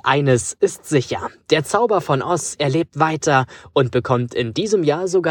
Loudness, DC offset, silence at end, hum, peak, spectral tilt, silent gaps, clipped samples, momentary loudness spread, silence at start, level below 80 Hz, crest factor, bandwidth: -19 LUFS; under 0.1%; 0 s; none; -2 dBFS; -5 dB/octave; none; under 0.1%; 5 LU; 0.05 s; -54 dBFS; 18 dB; 17.5 kHz